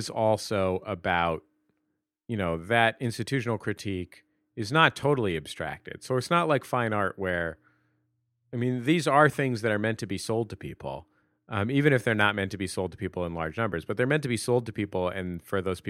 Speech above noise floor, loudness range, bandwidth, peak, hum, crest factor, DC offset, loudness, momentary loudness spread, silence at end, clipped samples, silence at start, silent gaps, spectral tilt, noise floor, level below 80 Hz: 53 dB; 3 LU; 16 kHz; -4 dBFS; none; 26 dB; under 0.1%; -27 LUFS; 13 LU; 0 s; under 0.1%; 0 s; none; -5.5 dB/octave; -80 dBFS; -58 dBFS